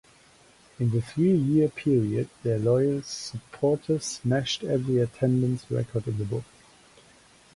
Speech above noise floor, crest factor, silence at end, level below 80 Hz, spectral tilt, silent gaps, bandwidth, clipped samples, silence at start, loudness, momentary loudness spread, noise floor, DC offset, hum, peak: 31 dB; 16 dB; 1.15 s; -58 dBFS; -6.5 dB/octave; none; 11.5 kHz; under 0.1%; 0.8 s; -26 LUFS; 8 LU; -57 dBFS; under 0.1%; none; -10 dBFS